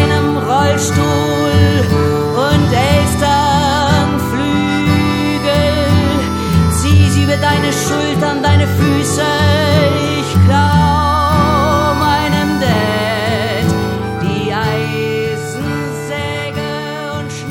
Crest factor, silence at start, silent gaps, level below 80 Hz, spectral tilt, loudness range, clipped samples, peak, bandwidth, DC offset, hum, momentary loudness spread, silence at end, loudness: 12 dB; 0 s; none; -28 dBFS; -5.5 dB/octave; 5 LU; under 0.1%; 0 dBFS; 16.5 kHz; under 0.1%; none; 8 LU; 0 s; -13 LUFS